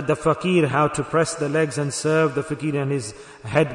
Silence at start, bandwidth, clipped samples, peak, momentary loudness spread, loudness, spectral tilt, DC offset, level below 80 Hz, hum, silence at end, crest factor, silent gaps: 0 s; 11 kHz; under 0.1%; -4 dBFS; 7 LU; -22 LUFS; -5.5 dB/octave; under 0.1%; -54 dBFS; none; 0 s; 18 dB; none